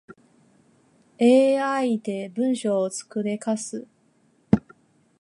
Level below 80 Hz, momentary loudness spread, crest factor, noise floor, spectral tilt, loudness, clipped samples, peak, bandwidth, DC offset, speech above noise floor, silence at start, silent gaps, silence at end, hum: -56 dBFS; 11 LU; 22 dB; -63 dBFS; -5.5 dB/octave; -23 LUFS; under 0.1%; -4 dBFS; 11.5 kHz; under 0.1%; 40 dB; 0.1 s; none; 0.65 s; none